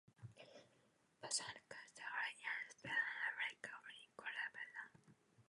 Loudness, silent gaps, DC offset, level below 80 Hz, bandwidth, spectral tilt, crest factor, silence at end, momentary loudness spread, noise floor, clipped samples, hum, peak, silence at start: -46 LUFS; none; under 0.1%; -88 dBFS; 11 kHz; -0.5 dB/octave; 22 dB; 0.05 s; 18 LU; -77 dBFS; under 0.1%; none; -28 dBFS; 0.2 s